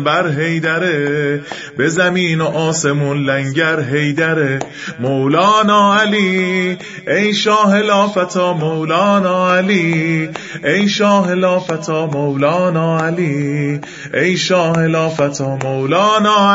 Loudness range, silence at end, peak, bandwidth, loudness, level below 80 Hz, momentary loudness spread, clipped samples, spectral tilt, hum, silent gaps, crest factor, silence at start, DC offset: 3 LU; 0 s; 0 dBFS; 8 kHz; -14 LUFS; -58 dBFS; 8 LU; under 0.1%; -5 dB/octave; none; none; 14 dB; 0 s; under 0.1%